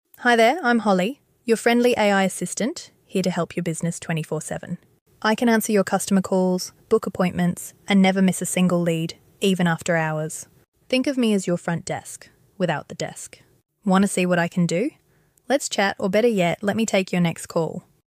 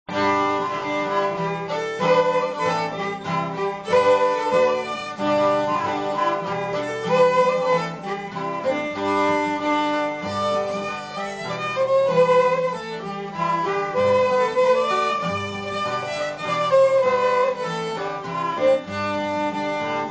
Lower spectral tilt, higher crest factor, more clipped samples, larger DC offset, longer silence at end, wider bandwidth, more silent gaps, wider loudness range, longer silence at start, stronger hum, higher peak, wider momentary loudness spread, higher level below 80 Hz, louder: about the same, -5 dB/octave vs -5 dB/octave; about the same, 16 dB vs 14 dB; neither; neither; first, 0.25 s vs 0 s; first, 16 kHz vs 8 kHz; first, 5.01-5.06 s, 10.68-10.72 s vs none; about the same, 4 LU vs 2 LU; about the same, 0.2 s vs 0.1 s; neither; about the same, -6 dBFS vs -8 dBFS; first, 13 LU vs 9 LU; about the same, -62 dBFS vs -58 dBFS; about the same, -22 LUFS vs -22 LUFS